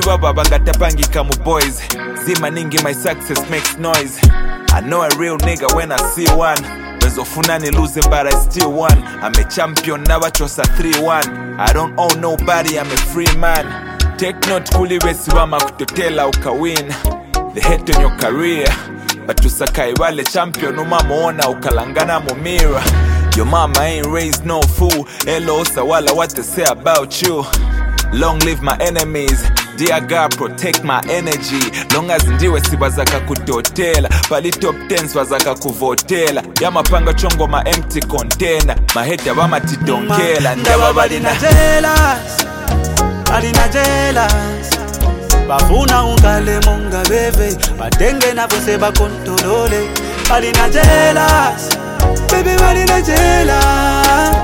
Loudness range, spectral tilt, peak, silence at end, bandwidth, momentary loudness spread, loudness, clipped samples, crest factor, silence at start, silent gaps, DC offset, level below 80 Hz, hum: 4 LU; -4 dB/octave; 0 dBFS; 0 s; 17 kHz; 6 LU; -14 LUFS; under 0.1%; 12 dB; 0 s; none; under 0.1%; -18 dBFS; none